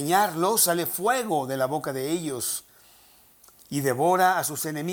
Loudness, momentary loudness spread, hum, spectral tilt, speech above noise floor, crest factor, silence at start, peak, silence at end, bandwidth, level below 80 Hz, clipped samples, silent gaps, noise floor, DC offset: -24 LUFS; 8 LU; none; -3.5 dB/octave; 31 dB; 20 dB; 0 s; -6 dBFS; 0 s; over 20 kHz; -68 dBFS; under 0.1%; none; -56 dBFS; under 0.1%